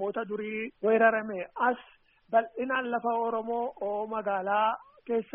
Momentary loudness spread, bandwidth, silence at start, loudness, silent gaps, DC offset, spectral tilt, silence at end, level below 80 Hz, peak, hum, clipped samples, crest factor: 10 LU; 3.6 kHz; 0 s; -29 LUFS; none; under 0.1%; -3 dB/octave; 0.1 s; -72 dBFS; -10 dBFS; none; under 0.1%; 20 dB